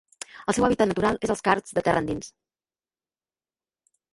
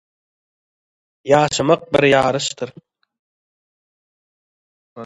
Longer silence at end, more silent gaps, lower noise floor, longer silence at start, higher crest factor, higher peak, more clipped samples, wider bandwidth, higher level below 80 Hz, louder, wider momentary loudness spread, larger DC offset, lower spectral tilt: first, 1.85 s vs 0 s; second, none vs 3.19-4.96 s; about the same, under -90 dBFS vs under -90 dBFS; second, 0.35 s vs 1.25 s; about the same, 22 dB vs 20 dB; second, -4 dBFS vs 0 dBFS; neither; about the same, 11.5 kHz vs 11.5 kHz; about the same, -52 dBFS vs -54 dBFS; second, -24 LUFS vs -16 LUFS; second, 12 LU vs 16 LU; neither; about the same, -5 dB/octave vs -4.5 dB/octave